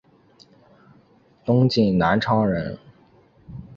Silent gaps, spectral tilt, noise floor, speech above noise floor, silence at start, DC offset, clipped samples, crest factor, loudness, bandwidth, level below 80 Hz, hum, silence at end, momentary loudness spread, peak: none; -8 dB/octave; -56 dBFS; 37 dB; 1.45 s; under 0.1%; under 0.1%; 18 dB; -21 LUFS; 7.2 kHz; -50 dBFS; none; 0 s; 22 LU; -4 dBFS